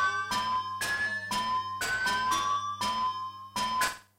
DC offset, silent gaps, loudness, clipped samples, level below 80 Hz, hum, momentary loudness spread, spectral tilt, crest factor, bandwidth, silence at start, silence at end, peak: under 0.1%; none; -30 LUFS; under 0.1%; -60 dBFS; none; 4 LU; -1 dB/octave; 14 dB; 16 kHz; 0 s; 0.15 s; -16 dBFS